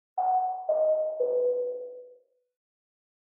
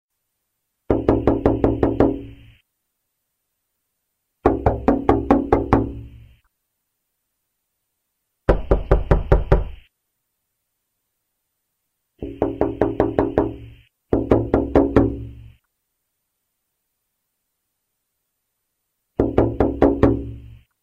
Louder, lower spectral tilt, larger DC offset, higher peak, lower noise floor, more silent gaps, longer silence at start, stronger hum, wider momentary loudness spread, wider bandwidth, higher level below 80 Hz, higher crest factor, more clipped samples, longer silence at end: second, -28 LUFS vs -20 LUFS; second, 2 dB/octave vs -10 dB/octave; neither; second, -18 dBFS vs -2 dBFS; second, -59 dBFS vs -76 dBFS; neither; second, 0.15 s vs 0.9 s; neither; about the same, 14 LU vs 13 LU; second, 1.8 kHz vs 6.8 kHz; second, under -90 dBFS vs -30 dBFS; second, 12 dB vs 22 dB; neither; first, 1.2 s vs 0.25 s